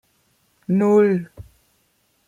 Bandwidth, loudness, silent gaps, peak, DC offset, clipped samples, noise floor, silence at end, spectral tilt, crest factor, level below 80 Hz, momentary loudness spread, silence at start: 9.4 kHz; -18 LUFS; none; -6 dBFS; under 0.1%; under 0.1%; -65 dBFS; 0.85 s; -9 dB/octave; 16 dB; -56 dBFS; 23 LU; 0.7 s